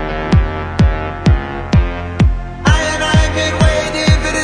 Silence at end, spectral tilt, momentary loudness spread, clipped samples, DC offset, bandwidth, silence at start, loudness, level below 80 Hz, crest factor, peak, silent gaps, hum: 0 s; -5.5 dB/octave; 4 LU; under 0.1%; under 0.1%; 10.5 kHz; 0 s; -15 LUFS; -18 dBFS; 14 dB; 0 dBFS; none; none